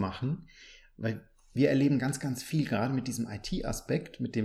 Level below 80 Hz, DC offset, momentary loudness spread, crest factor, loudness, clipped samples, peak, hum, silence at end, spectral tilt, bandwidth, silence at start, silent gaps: -50 dBFS; under 0.1%; 11 LU; 18 dB; -31 LUFS; under 0.1%; -14 dBFS; none; 0 s; -6 dB/octave; 15 kHz; 0 s; none